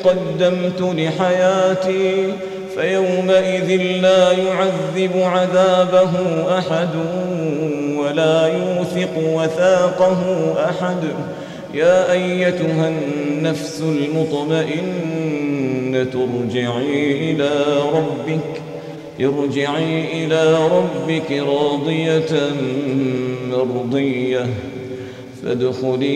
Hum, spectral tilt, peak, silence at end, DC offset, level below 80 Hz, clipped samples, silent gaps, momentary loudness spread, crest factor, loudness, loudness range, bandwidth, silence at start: none; -6 dB/octave; -2 dBFS; 0 s; under 0.1%; -58 dBFS; under 0.1%; none; 8 LU; 14 dB; -18 LUFS; 4 LU; 11.5 kHz; 0 s